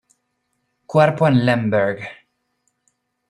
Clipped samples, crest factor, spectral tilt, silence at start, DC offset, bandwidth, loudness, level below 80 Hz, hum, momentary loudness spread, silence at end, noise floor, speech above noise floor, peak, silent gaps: under 0.1%; 18 dB; -8 dB/octave; 0.9 s; under 0.1%; 11 kHz; -17 LUFS; -60 dBFS; none; 13 LU; 1.15 s; -72 dBFS; 55 dB; -2 dBFS; none